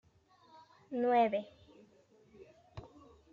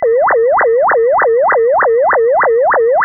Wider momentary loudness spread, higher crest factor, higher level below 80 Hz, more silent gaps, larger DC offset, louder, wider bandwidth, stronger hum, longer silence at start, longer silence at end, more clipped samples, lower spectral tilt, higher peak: first, 24 LU vs 0 LU; first, 20 dB vs 6 dB; second, -72 dBFS vs -52 dBFS; neither; neither; second, -33 LUFS vs -10 LUFS; first, 7 kHz vs 2.1 kHz; neither; first, 0.9 s vs 0 s; first, 0.5 s vs 0 s; neither; first, -4 dB/octave vs 5.5 dB/octave; second, -20 dBFS vs -4 dBFS